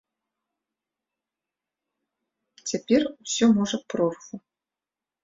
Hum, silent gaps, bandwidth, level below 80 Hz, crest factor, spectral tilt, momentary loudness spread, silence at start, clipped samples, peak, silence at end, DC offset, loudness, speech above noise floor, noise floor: none; none; 7.8 kHz; -66 dBFS; 20 dB; -4.5 dB/octave; 19 LU; 2.65 s; under 0.1%; -8 dBFS; 0.85 s; under 0.1%; -24 LUFS; 66 dB; -90 dBFS